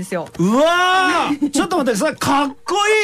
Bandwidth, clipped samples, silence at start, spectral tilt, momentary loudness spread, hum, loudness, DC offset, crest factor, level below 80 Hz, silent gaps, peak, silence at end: 15.5 kHz; under 0.1%; 0 s; -4 dB/octave; 5 LU; none; -16 LUFS; under 0.1%; 10 dB; -52 dBFS; none; -8 dBFS; 0 s